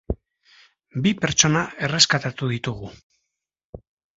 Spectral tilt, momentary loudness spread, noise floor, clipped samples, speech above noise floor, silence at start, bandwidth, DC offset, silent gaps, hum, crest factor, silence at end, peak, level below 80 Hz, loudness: -3 dB/octave; 16 LU; -82 dBFS; under 0.1%; 60 dB; 0.1 s; 8.4 kHz; under 0.1%; 3.03-3.10 s, 3.65-3.73 s; none; 24 dB; 0.4 s; 0 dBFS; -46 dBFS; -20 LUFS